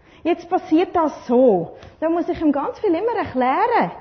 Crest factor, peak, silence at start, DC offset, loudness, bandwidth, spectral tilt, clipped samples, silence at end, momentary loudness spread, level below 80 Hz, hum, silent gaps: 14 dB; -4 dBFS; 0.25 s; under 0.1%; -20 LUFS; 6.4 kHz; -7.5 dB/octave; under 0.1%; 0 s; 7 LU; -52 dBFS; none; none